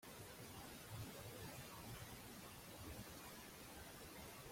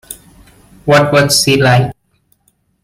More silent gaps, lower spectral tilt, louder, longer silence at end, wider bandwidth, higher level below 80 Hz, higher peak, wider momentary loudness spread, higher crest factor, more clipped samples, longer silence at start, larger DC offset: neither; about the same, -3.5 dB/octave vs -4 dB/octave; second, -55 LUFS vs -10 LUFS; second, 0 s vs 0.9 s; about the same, 16.5 kHz vs 16.5 kHz; second, -68 dBFS vs -44 dBFS; second, -40 dBFS vs 0 dBFS; second, 3 LU vs 18 LU; about the same, 16 dB vs 14 dB; neither; about the same, 0 s vs 0.1 s; neither